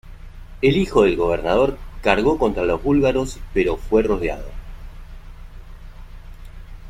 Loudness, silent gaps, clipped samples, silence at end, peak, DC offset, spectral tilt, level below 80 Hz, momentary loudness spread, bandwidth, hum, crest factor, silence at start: -19 LUFS; none; under 0.1%; 0 s; -2 dBFS; under 0.1%; -6.5 dB/octave; -32 dBFS; 10 LU; 14 kHz; none; 18 dB; 0.05 s